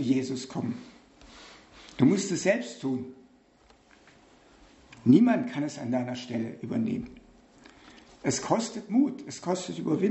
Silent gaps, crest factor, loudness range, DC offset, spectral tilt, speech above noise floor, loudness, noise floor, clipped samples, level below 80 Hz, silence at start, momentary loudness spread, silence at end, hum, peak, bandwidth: none; 22 dB; 4 LU; under 0.1%; -5.5 dB/octave; 33 dB; -28 LUFS; -60 dBFS; under 0.1%; -64 dBFS; 0 s; 21 LU; 0 s; none; -6 dBFS; 8.2 kHz